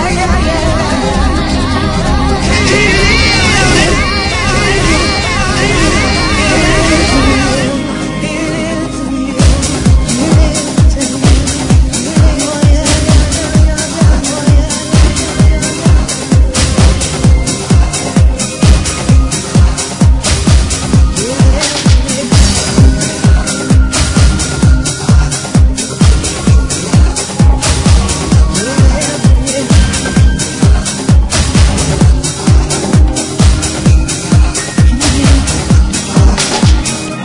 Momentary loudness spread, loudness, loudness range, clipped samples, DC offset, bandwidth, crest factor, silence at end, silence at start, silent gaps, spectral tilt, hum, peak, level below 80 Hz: 3 LU; -10 LUFS; 1 LU; 0.7%; under 0.1%; 11 kHz; 8 dB; 0 s; 0 s; none; -4.5 dB/octave; none; 0 dBFS; -12 dBFS